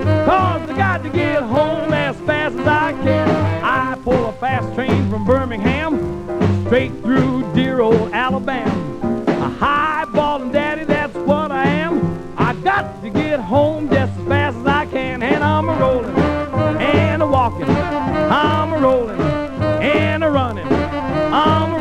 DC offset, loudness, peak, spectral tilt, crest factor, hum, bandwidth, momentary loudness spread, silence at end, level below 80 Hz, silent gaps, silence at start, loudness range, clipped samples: under 0.1%; -17 LUFS; 0 dBFS; -7.5 dB/octave; 16 dB; none; 10.5 kHz; 5 LU; 0 s; -38 dBFS; none; 0 s; 2 LU; under 0.1%